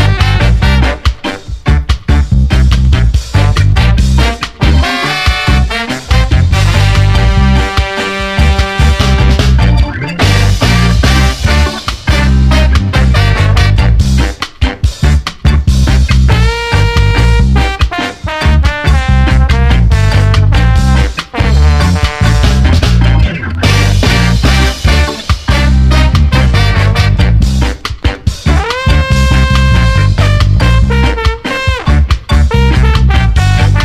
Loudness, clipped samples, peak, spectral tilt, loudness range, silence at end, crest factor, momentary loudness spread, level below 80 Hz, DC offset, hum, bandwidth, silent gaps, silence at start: -10 LUFS; 0.6%; 0 dBFS; -5.5 dB/octave; 1 LU; 0 s; 8 dB; 5 LU; -10 dBFS; under 0.1%; none; 13.5 kHz; none; 0 s